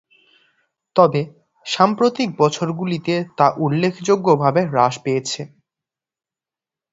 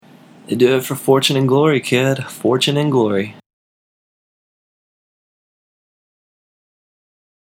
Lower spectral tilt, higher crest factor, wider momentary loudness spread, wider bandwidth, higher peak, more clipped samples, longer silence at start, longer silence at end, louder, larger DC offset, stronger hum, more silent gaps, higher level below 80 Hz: about the same, -5.5 dB/octave vs -5 dB/octave; about the same, 20 dB vs 20 dB; first, 11 LU vs 6 LU; second, 8 kHz vs 17 kHz; about the same, 0 dBFS vs 0 dBFS; neither; first, 0.95 s vs 0.5 s; second, 1.45 s vs 4.1 s; about the same, -18 LUFS vs -16 LUFS; neither; neither; neither; first, -62 dBFS vs -72 dBFS